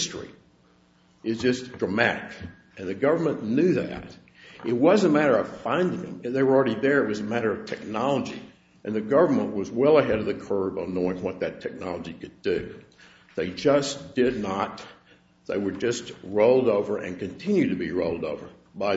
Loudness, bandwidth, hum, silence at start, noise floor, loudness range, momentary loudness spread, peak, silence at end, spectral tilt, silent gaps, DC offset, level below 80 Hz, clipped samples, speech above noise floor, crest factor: -25 LUFS; 8 kHz; none; 0 s; -60 dBFS; 5 LU; 16 LU; -4 dBFS; 0 s; -5.5 dB/octave; none; under 0.1%; -58 dBFS; under 0.1%; 35 dB; 22 dB